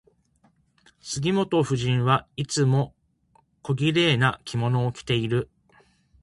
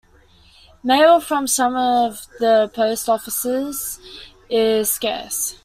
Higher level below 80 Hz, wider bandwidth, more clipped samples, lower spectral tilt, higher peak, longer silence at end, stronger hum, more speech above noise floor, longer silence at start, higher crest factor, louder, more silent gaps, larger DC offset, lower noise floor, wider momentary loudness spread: about the same, -56 dBFS vs -54 dBFS; second, 11.5 kHz vs 16 kHz; neither; first, -5.5 dB/octave vs -2 dB/octave; about the same, -6 dBFS vs -4 dBFS; first, 0.75 s vs 0.1 s; neither; first, 41 dB vs 33 dB; first, 1.05 s vs 0.85 s; about the same, 20 dB vs 16 dB; second, -24 LUFS vs -18 LUFS; neither; neither; first, -64 dBFS vs -51 dBFS; about the same, 12 LU vs 13 LU